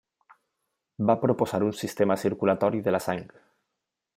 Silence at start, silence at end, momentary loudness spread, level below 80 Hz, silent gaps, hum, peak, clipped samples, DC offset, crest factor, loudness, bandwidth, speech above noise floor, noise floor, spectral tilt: 1 s; 0.9 s; 5 LU; -68 dBFS; none; none; -8 dBFS; under 0.1%; under 0.1%; 20 dB; -26 LUFS; 16 kHz; 59 dB; -84 dBFS; -6.5 dB/octave